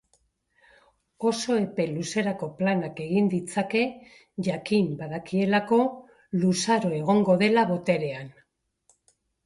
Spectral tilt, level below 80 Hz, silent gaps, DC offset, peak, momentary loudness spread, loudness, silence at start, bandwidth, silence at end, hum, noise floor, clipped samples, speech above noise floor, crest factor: -5.5 dB/octave; -66 dBFS; none; under 0.1%; -8 dBFS; 10 LU; -25 LUFS; 1.2 s; 11.5 kHz; 1.15 s; none; -69 dBFS; under 0.1%; 45 dB; 18 dB